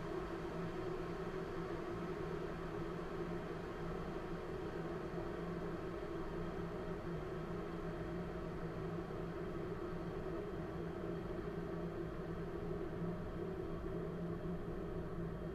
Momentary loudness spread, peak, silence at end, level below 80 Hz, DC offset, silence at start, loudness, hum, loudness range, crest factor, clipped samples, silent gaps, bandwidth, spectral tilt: 1 LU; -30 dBFS; 0 s; -54 dBFS; under 0.1%; 0 s; -45 LUFS; none; 0 LU; 14 dB; under 0.1%; none; 13.5 kHz; -8 dB/octave